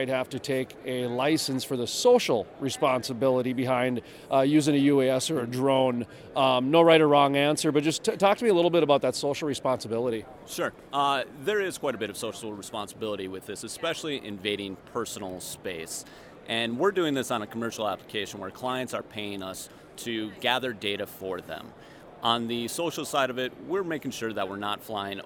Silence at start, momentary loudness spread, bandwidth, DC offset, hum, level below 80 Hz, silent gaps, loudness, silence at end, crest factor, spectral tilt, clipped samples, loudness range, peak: 0 s; 14 LU; 18 kHz; under 0.1%; none; -66 dBFS; none; -27 LUFS; 0 s; 22 dB; -4.5 dB/octave; under 0.1%; 10 LU; -6 dBFS